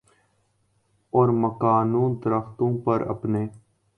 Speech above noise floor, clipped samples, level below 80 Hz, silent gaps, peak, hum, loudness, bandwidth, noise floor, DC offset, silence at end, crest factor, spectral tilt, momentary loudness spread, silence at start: 46 dB; under 0.1%; -58 dBFS; none; -6 dBFS; none; -24 LUFS; 5.8 kHz; -68 dBFS; under 0.1%; 0.4 s; 18 dB; -11 dB/octave; 6 LU; 1.15 s